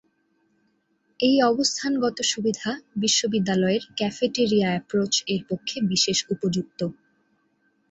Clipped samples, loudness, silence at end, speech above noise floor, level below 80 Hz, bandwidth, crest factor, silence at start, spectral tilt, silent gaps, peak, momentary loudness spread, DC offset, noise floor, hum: under 0.1%; -23 LUFS; 1 s; 45 dB; -64 dBFS; 8.2 kHz; 18 dB; 1.2 s; -3.5 dB/octave; none; -6 dBFS; 8 LU; under 0.1%; -69 dBFS; none